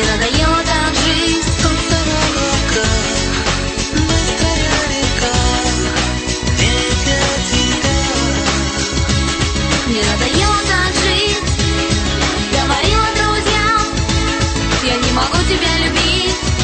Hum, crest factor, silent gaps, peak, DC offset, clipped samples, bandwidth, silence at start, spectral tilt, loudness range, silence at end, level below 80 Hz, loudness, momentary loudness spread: none; 14 dB; none; 0 dBFS; under 0.1%; under 0.1%; 8.8 kHz; 0 s; -3.5 dB/octave; 1 LU; 0 s; -22 dBFS; -14 LUFS; 3 LU